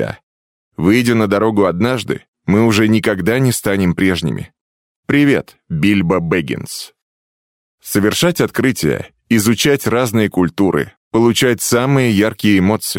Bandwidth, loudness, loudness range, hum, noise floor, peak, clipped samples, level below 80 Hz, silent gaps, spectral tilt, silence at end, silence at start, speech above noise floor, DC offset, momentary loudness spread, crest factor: 17 kHz; -15 LUFS; 4 LU; none; under -90 dBFS; 0 dBFS; under 0.1%; -46 dBFS; 0.23-0.71 s, 2.28-2.33 s, 4.61-5.03 s, 7.02-7.78 s, 10.97-11.11 s; -5 dB/octave; 0 s; 0 s; over 76 dB; under 0.1%; 11 LU; 14 dB